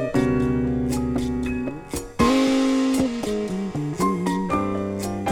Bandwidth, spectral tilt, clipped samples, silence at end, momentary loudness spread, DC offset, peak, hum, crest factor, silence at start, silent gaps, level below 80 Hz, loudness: 16.5 kHz; -6 dB/octave; under 0.1%; 0 s; 8 LU; under 0.1%; -6 dBFS; none; 16 dB; 0 s; none; -38 dBFS; -23 LUFS